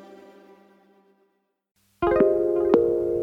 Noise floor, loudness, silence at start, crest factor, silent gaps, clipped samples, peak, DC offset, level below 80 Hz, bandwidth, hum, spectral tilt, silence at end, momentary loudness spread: -70 dBFS; -21 LUFS; 0.1 s; 20 dB; 1.71-1.75 s; under 0.1%; -4 dBFS; under 0.1%; -50 dBFS; 5.2 kHz; none; -9 dB/octave; 0 s; 4 LU